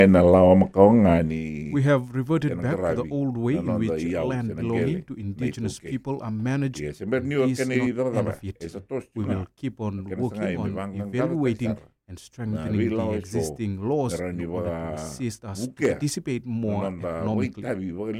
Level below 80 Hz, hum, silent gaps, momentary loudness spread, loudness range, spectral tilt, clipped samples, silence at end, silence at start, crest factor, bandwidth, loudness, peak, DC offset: -50 dBFS; none; none; 14 LU; 7 LU; -7.5 dB/octave; under 0.1%; 0 s; 0 s; 24 dB; 14.5 kHz; -25 LUFS; 0 dBFS; under 0.1%